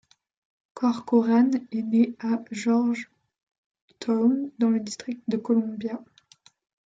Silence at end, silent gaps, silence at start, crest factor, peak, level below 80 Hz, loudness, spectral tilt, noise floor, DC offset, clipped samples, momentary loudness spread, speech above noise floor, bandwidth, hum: 0.85 s; 3.43-3.47 s, 3.58-3.71 s, 3.82-3.88 s; 0.75 s; 16 dB; -10 dBFS; -74 dBFS; -25 LUFS; -6 dB/octave; -58 dBFS; under 0.1%; under 0.1%; 12 LU; 34 dB; 7.8 kHz; none